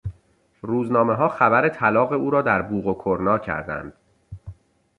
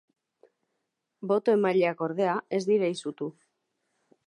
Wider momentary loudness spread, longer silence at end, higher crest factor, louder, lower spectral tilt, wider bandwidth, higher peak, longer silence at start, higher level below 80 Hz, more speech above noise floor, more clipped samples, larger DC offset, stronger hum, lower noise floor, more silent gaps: first, 20 LU vs 14 LU; second, 0.45 s vs 0.95 s; about the same, 20 dB vs 16 dB; first, -21 LUFS vs -27 LUFS; first, -9 dB/octave vs -6 dB/octave; about the same, 9.8 kHz vs 10.5 kHz; first, -2 dBFS vs -12 dBFS; second, 0.05 s vs 1.2 s; first, -48 dBFS vs -84 dBFS; second, 39 dB vs 55 dB; neither; neither; neither; second, -60 dBFS vs -81 dBFS; neither